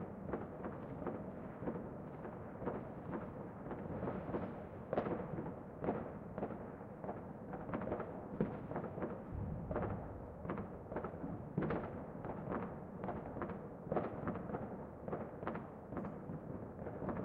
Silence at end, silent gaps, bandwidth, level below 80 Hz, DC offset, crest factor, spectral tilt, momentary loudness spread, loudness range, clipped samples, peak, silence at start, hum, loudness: 0 s; none; 4.8 kHz; -60 dBFS; under 0.1%; 22 dB; -10.5 dB/octave; 7 LU; 2 LU; under 0.1%; -22 dBFS; 0 s; none; -45 LUFS